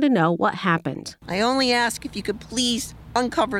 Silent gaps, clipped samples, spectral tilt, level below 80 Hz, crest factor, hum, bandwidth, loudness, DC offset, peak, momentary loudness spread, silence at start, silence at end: none; under 0.1%; -4 dB/octave; -50 dBFS; 14 dB; none; 16 kHz; -23 LUFS; under 0.1%; -8 dBFS; 10 LU; 0 s; 0 s